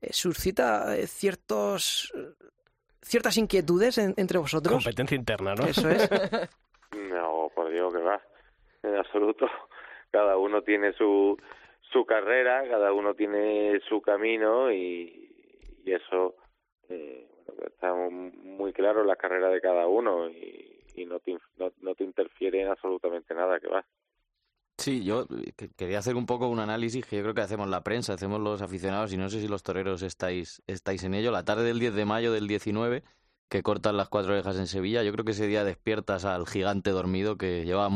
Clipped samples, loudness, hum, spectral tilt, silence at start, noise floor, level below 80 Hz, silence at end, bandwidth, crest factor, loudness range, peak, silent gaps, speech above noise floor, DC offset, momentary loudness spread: under 0.1%; -28 LUFS; none; -5 dB/octave; 0 s; -81 dBFS; -58 dBFS; 0 s; 14 kHz; 18 dB; 6 LU; -10 dBFS; 33.39-33.48 s; 53 dB; under 0.1%; 13 LU